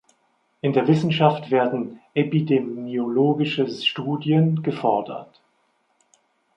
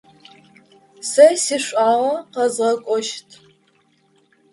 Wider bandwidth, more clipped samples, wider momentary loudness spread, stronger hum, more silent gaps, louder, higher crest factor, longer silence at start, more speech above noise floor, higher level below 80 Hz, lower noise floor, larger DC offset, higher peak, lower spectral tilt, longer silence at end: second, 7.8 kHz vs 11.5 kHz; neither; second, 8 LU vs 13 LU; neither; neither; second, -22 LUFS vs -18 LUFS; about the same, 20 dB vs 20 dB; second, 0.65 s vs 1 s; about the same, 46 dB vs 43 dB; about the same, -68 dBFS vs -72 dBFS; first, -67 dBFS vs -60 dBFS; neither; about the same, -2 dBFS vs 0 dBFS; first, -8 dB/octave vs -2 dB/octave; about the same, 1.35 s vs 1.3 s